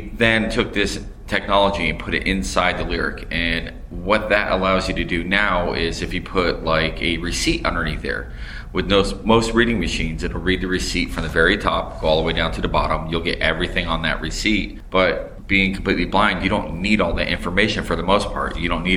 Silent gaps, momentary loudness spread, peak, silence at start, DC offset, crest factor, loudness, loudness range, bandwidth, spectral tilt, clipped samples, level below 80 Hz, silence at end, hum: none; 7 LU; -2 dBFS; 0 s; under 0.1%; 18 dB; -20 LUFS; 2 LU; 15.5 kHz; -4.5 dB/octave; under 0.1%; -30 dBFS; 0 s; none